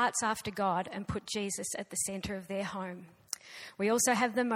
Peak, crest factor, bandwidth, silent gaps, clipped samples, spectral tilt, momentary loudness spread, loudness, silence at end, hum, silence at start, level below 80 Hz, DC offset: -14 dBFS; 20 dB; 17.5 kHz; none; under 0.1%; -3 dB/octave; 14 LU; -33 LUFS; 0 s; none; 0 s; -60 dBFS; under 0.1%